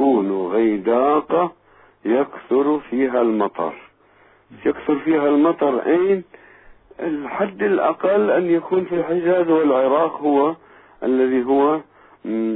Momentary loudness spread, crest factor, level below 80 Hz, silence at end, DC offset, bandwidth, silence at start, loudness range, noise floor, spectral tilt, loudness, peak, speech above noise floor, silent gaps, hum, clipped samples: 9 LU; 14 dB; -60 dBFS; 0 s; under 0.1%; 4 kHz; 0 s; 3 LU; -54 dBFS; -11 dB/octave; -19 LUFS; -6 dBFS; 35 dB; none; none; under 0.1%